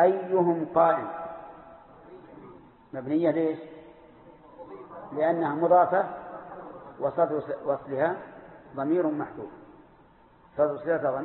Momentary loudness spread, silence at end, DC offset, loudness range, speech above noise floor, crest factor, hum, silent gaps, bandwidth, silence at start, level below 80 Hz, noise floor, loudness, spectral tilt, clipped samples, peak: 23 LU; 0 s; under 0.1%; 6 LU; 31 dB; 20 dB; none; none; 4.2 kHz; 0 s; -68 dBFS; -57 dBFS; -27 LUFS; -11.5 dB/octave; under 0.1%; -8 dBFS